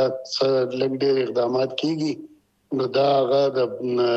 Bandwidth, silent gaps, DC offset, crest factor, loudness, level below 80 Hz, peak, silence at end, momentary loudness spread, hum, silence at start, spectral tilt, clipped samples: 8.2 kHz; none; under 0.1%; 14 dB; -22 LUFS; -72 dBFS; -8 dBFS; 0 s; 7 LU; none; 0 s; -6 dB/octave; under 0.1%